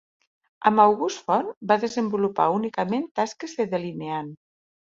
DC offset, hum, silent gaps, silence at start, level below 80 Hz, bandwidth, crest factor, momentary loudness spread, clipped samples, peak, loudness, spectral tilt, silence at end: under 0.1%; none; 1.57-1.61 s, 3.11-3.15 s; 0.6 s; -70 dBFS; 7.6 kHz; 22 dB; 12 LU; under 0.1%; -4 dBFS; -24 LUFS; -5.5 dB/octave; 0.6 s